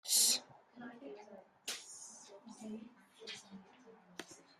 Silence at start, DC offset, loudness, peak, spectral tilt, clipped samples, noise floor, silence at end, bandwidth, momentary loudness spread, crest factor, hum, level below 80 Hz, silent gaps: 0.05 s; under 0.1%; -36 LUFS; -18 dBFS; 0.5 dB/octave; under 0.1%; -62 dBFS; 0.2 s; 15 kHz; 27 LU; 26 dB; none; under -90 dBFS; none